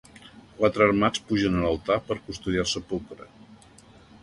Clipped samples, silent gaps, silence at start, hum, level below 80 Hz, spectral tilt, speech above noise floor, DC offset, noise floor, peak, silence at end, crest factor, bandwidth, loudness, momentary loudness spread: under 0.1%; none; 0.25 s; none; -48 dBFS; -5 dB/octave; 27 dB; under 0.1%; -52 dBFS; -8 dBFS; 0.7 s; 20 dB; 11.5 kHz; -25 LUFS; 13 LU